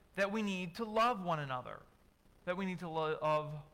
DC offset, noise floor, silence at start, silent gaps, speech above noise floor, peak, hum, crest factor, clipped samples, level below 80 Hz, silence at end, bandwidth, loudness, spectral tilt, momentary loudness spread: under 0.1%; -66 dBFS; 0.15 s; none; 30 dB; -24 dBFS; none; 14 dB; under 0.1%; -68 dBFS; 0.05 s; 16.5 kHz; -37 LUFS; -6 dB/octave; 10 LU